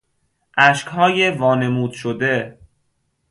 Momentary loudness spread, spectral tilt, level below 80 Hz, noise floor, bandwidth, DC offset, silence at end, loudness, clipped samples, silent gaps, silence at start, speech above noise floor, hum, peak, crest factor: 10 LU; -5 dB/octave; -58 dBFS; -68 dBFS; 11.5 kHz; under 0.1%; 0.8 s; -17 LUFS; under 0.1%; none; 0.55 s; 51 dB; none; 0 dBFS; 20 dB